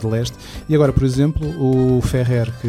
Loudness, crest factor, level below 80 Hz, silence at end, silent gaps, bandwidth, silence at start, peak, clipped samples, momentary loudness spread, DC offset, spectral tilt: -18 LUFS; 16 dB; -32 dBFS; 0 s; none; 14.5 kHz; 0 s; -2 dBFS; under 0.1%; 7 LU; under 0.1%; -7.5 dB/octave